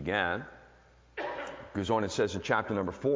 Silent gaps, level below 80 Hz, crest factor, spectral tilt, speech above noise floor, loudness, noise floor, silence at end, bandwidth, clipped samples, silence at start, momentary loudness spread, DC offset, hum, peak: none; -54 dBFS; 20 dB; -5 dB/octave; 29 dB; -32 LUFS; -59 dBFS; 0 s; 7.6 kHz; under 0.1%; 0 s; 11 LU; under 0.1%; none; -12 dBFS